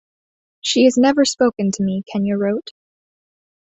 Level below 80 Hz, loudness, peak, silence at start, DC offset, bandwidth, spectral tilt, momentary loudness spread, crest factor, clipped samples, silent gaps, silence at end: -60 dBFS; -18 LUFS; -2 dBFS; 0.65 s; under 0.1%; 8.2 kHz; -4.5 dB/octave; 9 LU; 16 dB; under 0.1%; none; 1.05 s